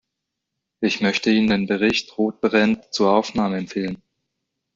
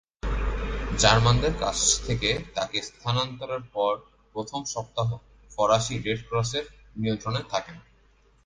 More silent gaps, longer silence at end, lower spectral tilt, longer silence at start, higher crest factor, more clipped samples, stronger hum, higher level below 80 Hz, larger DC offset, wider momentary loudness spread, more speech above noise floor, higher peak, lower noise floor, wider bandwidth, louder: neither; first, 0.8 s vs 0.65 s; first, -5 dB/octave vs -3.5 dB/octave; first, 0.8 s vs 0.25 s; second, 18 dB vs 24 dB; neither; neither; second, -56 dBFS vs -38 dBFS; neither; second, 8 LU vs 12 LU; first, 61 dB vs 34 dB; about the same, -4 dBFS vs -2 dBFS; first, -81 dBFS vs -60 dBFS; second, 7.6 kHz vs 10 kHz; first, -20 LUFS vs -26 LUFS